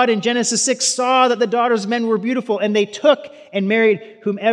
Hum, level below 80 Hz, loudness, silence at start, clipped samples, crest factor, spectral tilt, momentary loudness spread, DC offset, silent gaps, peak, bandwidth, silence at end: none; -86 dBFS; -17 LUFS; 0 s; under 0.1%; 16 dB; -3 dB/octave; 6 LU; under 0.1%; none; -2 dBFS; 12 kHz; 0 s